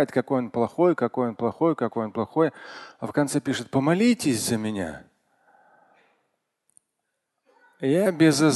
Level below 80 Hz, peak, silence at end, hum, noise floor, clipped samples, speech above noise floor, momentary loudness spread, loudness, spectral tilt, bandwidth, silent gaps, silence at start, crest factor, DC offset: -62 dBFS; -6 dBFS; 0 s; none; -79 dBFS; under 0.1%; 56 dB; 11 LU; -24 LUFS; -5.5 dB/octave; 12.5 kHz; none; 0 s; 20 dB; under 0.1%